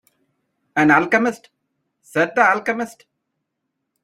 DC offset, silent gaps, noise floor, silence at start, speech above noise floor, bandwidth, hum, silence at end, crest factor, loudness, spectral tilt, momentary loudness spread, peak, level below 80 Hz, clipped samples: under 0.1%; none; -77 dBFS; 0.75 s; 60 dB; 15 kHz; none; 1.15 s; 20 dB; -18 LUFS; -5.5 dB/octave; 12 LU; -2 dBFS; -66 dBFS; under 0.1%